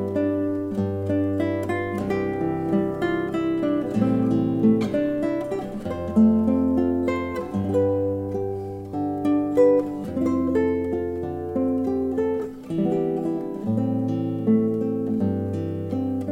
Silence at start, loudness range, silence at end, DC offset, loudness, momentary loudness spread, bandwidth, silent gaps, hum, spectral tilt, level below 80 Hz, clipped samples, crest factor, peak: 0 s; 3 LU; 0 s; under 0.1%; -24 LUFS; 8 LU; 11.5 kHz; none; none; -9 dB/octave; -50 dBFS; under 0.1%; 16 dB; -8 dBFS